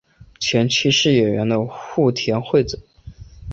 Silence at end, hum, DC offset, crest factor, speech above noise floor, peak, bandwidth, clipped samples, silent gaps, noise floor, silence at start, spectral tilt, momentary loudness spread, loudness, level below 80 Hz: 0 s; none; under 0.1%; 16 dB; 22 dB; -4 dBFS; 8 kHz; under 0.1%; none; -40 dBFS; 0.2 s; -4.5 dB/octave; 10 LU; -18 LUFS; -44 dBFS